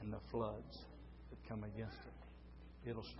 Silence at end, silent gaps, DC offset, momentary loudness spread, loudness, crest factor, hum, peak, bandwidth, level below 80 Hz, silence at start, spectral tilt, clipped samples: 0 s; none; under 0.1%; 16 LU; -50 LUFS; 20 dB; none; -28 dBFS; 5.6 kHz; -58 dBFS; 0 s; -6 dB/octave; under 0.1%